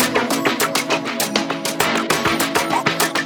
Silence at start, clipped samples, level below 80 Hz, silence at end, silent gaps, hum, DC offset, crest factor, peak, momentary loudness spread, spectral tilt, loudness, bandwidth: 0 s; under 0.1%; -52 dBFS; 0 s; none; none; under 0.1%; 18 dB; -2 dBFS; 3 LU; -2.5 dB/octave; -18 LUFS; over 20 kHz